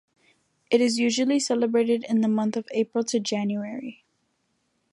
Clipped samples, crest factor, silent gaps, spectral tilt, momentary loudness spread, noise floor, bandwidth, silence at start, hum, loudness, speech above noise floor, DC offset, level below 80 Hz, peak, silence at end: under 0.1%; 18 dB; none; -4.5 dB/octave; 8 LU; -73 dBFS; 11.5 kHz; 0.7 s; none; -24 LUFS; 49 dB; under 0.1%; -76 dBFS; -8 dBFS; 1 s